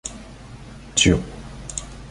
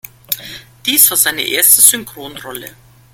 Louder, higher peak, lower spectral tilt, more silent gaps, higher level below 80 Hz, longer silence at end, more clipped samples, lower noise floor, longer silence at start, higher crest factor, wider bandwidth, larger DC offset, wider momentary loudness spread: second, -21 LUFS vs -9 LUFS; about the same, -2 dBFS vs 0 dBFS; first, -3.5 dB/octave vs 0.5 dB/octave; neither; first, -36 dBFS vs -54 dBFS; second, 0 s vs 0.45 s; second, under 0.1% vs 0.5%; first, -40 dBFS vs -34 dBFS; second, 0.05 s vs 0.3 s; first, 22 dB vs 16 dB; second, 11.5 kHz vs over 20 kHz; neither; about the same, 24 LU vs 23 LU